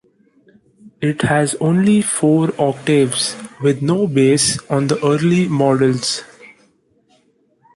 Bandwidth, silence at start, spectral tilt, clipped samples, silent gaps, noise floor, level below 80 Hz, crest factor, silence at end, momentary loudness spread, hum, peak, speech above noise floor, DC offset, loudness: 11.5 kHz; 0.85 s; -5 dB/octave; under 0.1%; none; -58 dBFS; -54 dBFS; 14 dB; 1.5 s; 6 LU; none; -2 dBFS; 43 dB; under 0.1%; -16 LUFS